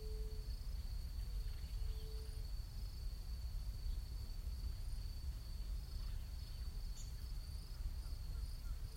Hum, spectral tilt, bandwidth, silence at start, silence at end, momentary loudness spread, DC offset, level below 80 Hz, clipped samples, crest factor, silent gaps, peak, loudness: none; -5 dB/octave; 16 kHz; 0 s; 0 s; 2 LU; under 0.1%; -44 dBFS; under 0.1%; 12 dB; none; -32 dBFS; -49 LUFS